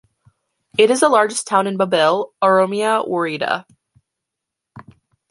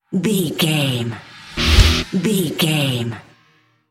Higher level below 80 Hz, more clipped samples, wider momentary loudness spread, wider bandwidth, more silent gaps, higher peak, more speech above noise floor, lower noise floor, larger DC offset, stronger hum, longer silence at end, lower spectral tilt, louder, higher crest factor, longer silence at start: second, -66 dBFS vs -24 dBFS; neither; second, 8 LU vs 14 LU; second, 11.5 kHz vs 16.5 kHz; neither; about the same, -2 dBFS vs 0 dBFS; first, 66 dB vs 38 dB; first, -82 dBFS vs -57 dBFS; neither; neither; second, 0.5 s vs 0.7 s; about the same, -3.5 dB/octave vs -4.5 dB/octave; about the same, -17 LUFS vs -18 LUFS; about the same, 18 dB vs 18 dB; first, 0.8 s vs 0.1 s